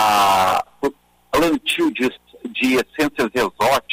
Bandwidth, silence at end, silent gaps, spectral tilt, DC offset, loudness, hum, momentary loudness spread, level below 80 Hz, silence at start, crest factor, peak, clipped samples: 16 kHz; 0 s; none; -3.5 dB/octave; under 0.1%; -19 LUFS; none; 11 LU; -48 dBFS; 0 s; 14 dB; -6 dBFS; under 0.1%